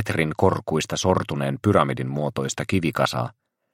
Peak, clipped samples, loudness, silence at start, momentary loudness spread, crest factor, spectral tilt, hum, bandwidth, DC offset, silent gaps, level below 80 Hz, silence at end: -2 dBFS; under 0.1%; -23 LUFS; 0 s; 6 LU; 22 dB; -5.5 dB/octave; none; 16.5 kHz; under 0.1%; none; -52 dBFS; 0.45 s